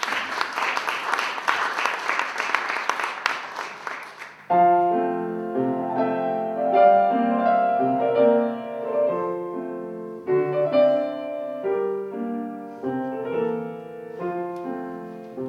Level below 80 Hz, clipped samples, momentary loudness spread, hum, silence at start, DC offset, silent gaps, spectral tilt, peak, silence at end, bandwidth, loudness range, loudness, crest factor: -78 dBFS; under 0.1%; 14 LU; none; 0 s; under 0.1%; none; -5 dB/octave; -2 dBFS; 0 s; 14 kHz; 8 LU; -23 LUFS; 22 dB